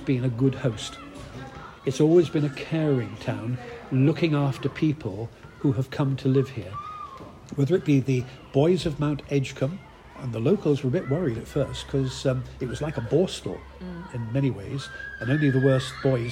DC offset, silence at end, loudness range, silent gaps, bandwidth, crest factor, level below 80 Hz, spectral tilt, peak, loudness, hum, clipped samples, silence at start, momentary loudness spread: under 0.1%; 0 s; 3 LU; none; 11.5 kHz; 18 dB; -50 dBFS; -7 dB/octave; -8 dBFS; -26 LUFS; none; under 0.1%; 0 s; 16 LU